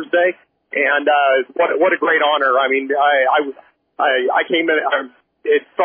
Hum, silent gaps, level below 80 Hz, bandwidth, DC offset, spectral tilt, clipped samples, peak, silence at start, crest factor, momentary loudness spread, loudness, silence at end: none; none; -76 dBFS; 3.6 kHz; under 0.1%; -6.5 dB/octave; under 0.1%; -4 dBFS; 0 s; 14 dB; 6 LU; -16 LUFS; 0 s